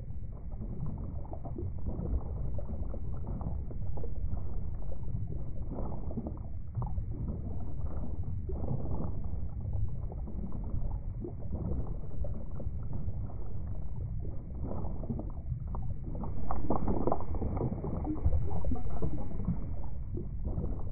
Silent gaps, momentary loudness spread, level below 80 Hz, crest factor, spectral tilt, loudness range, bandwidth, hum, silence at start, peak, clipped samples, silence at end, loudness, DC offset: none; 6 LU; -38 dBFS; 16 dB; -11 dB/octave; 5 LU; 2.4 kHz; none; 0 s; -14 dBFS; under 0.1%; 0 s; -39 LUFS; under 0.1%